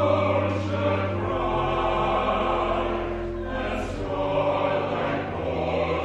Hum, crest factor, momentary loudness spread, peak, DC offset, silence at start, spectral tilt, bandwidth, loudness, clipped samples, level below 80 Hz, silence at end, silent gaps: none; 14 dB; 6 LU; -10 dBFS; under 0.1%; 0 s; -7 dB/octave; 8.8 kHz; -25 LUFS; under 0.1%; -40 dBFS; 0 s; none